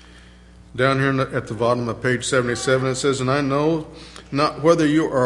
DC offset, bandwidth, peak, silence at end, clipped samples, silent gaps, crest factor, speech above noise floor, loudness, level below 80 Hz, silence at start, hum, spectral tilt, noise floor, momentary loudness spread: under 0.1%; 11.5 kHz; -2 dBFS; 0 s; under 0.1%; none; 18 dB; 26 dB; -20 LUFS; -48 dBFS; 0.15 s; none; -5.5 dB/octave; -45 dBFS; 9 LU